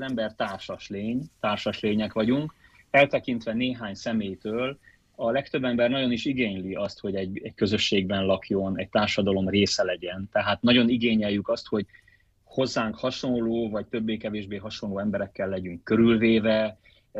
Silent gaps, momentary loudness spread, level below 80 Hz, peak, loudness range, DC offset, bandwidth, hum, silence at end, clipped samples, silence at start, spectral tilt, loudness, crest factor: none; 11 LU; -56 dBFS; -6 dBFS; 5 LU; under 0.1%; 8 kHz; none; 0 s; under 0.1%; 0 s; -5.5 dB/octave; -26 LUFS; 20 dB